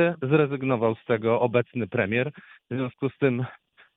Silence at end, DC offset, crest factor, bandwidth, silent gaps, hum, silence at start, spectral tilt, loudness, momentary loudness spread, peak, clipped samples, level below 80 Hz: 0.4 s; under 0.1%; 18 dB; 4 kHz; none; none; 0 s; -10.5 dB/octave; -25 LUFS; 9 LU; -8 dBFS; under 0.1%; -66 dBFS